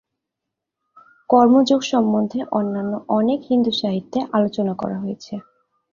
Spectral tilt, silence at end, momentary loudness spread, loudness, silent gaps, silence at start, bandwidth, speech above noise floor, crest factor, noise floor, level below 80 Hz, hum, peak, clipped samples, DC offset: -6 dB/octave; 0.55 s; 13 LU; -19 LUFS; none; 1.3 s; 7.4 kHz; 64 dB; 18 dB; -82 dBFS; -62 dBFS; none; -2 dBFS; under 0.1%; under 0.1%